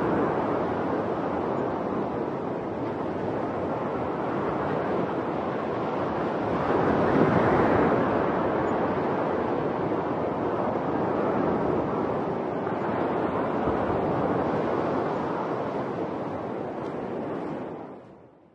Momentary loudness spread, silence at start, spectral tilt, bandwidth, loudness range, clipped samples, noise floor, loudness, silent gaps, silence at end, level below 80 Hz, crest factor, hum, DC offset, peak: 9 LU; 0 s; -8.5 dB/octave; 8.6 kHz; 5 LU; under 0.1%; -50 dBFS; -27 LUFS; none; 0.3 s; -54 dBFS; 20 dB; none; under 0.1%; -6 dBFS